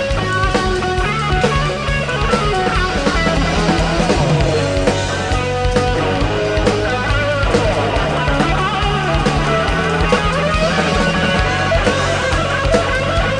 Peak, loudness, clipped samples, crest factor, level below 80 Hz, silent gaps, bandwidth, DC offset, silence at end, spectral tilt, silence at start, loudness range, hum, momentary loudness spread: -2 dBFS; -16 LUFS; under 0.1%; 14 dB; -24 dBFS; none; 10 kHz; 0.4%; 0 s; -5 dB/octave; 0 s; 1 LU; none; 2 LU